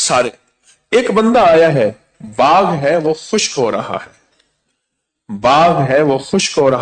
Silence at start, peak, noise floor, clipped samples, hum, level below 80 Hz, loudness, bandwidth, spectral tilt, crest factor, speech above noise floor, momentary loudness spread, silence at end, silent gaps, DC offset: 0 s; -2 dBFS; -74 dBFS; under 0.1%; none; -48 dBFS; -13 LUFS; 9.4 kHz; -4.5 dB/octave; 12 dB; 61 dB; 11 LU; 0 s; none; under 0.1%